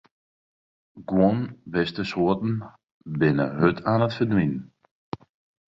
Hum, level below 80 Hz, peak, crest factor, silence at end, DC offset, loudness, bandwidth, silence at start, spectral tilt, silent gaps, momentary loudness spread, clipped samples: none; -54 dBFS; -6 dBFS; 20 dB; 1.05 s; under 0.1%; -24 LUFS; 7.6 kHz; 0.95 s; -8.5 dB/octave; 2.92-3.01 s; 18 LU; under 0.1%